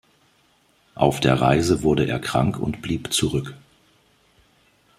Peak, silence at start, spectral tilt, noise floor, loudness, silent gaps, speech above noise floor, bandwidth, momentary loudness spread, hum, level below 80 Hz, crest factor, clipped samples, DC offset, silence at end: -2 dBFS; 0.95 s; -5.5 dB/octave; -61 dBFS; -21 LUFS; none; 40 dB; 15 kHz; 9 LU; none; -46 dBFS; 22 dB; under 0.1%; under 0.1%; 1.4 s